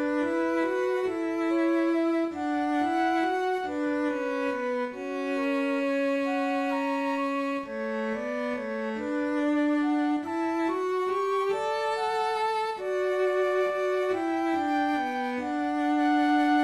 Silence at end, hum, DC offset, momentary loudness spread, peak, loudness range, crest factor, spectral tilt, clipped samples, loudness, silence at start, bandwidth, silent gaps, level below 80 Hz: 0 s; none; under 0.1%; 5 LU; -16 dBFS; 2 LU; 12 dB; -4.5 dB/octave; under 0.1%; -28 LUFS; 0 s; 12 kHz; none; -70 dBFS